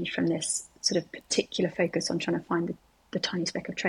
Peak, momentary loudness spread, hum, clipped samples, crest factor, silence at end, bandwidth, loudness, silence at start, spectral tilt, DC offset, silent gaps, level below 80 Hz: -10 dBFS; 5 LU; none; under 0.1%; 20 dB; 0 s; 13 kHz; -29 LUFS; 0 s; -3.5 dB/octave; under 0.1%; none; -66 dBFS